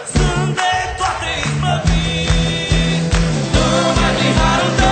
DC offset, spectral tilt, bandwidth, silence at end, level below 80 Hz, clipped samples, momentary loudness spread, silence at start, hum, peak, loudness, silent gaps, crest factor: under 0.1%; -4.5 dB/octave; 9.2 kHz; 0 s; -22 dBFS; under 0.1%; 4 LU; 0 s; none; -2 dBFS; -16 LUFS; none; 14 dB